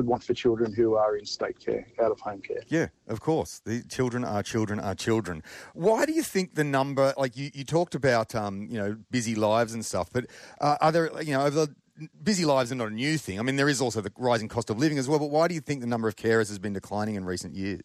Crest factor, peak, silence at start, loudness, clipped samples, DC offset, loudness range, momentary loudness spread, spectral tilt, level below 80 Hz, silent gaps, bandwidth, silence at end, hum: 16 dB; -12 dBFS; 0 s; -27 LUFS; under 0.1%; under 0.1%; 3 LU; 9 LU; -5 dB/octave; -62 dBFS; none; 14 kHz; 0 s; none